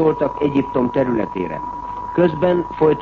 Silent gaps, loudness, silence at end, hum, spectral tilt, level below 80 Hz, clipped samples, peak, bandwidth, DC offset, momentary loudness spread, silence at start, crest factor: none; -19 LUFS; 0 s; none; -9 dB/octave; -44 dBFS; under 0.1%; -4 dBFS; 6.6 kHz; under 0.1%; 9 LU; 0 s; 14 dB